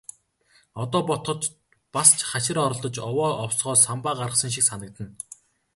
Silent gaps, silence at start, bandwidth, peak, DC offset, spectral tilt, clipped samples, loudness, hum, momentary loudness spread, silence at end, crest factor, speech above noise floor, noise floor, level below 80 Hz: none; 0.75 s; 12 kHz; -2 dBFS; under 0.1%; -3 dB/octave; under 0.1%; -22 LUFS; none; 20 LU; 0.65 s; 24 dB; 38 dB; -62 dBFS; -60 dBFS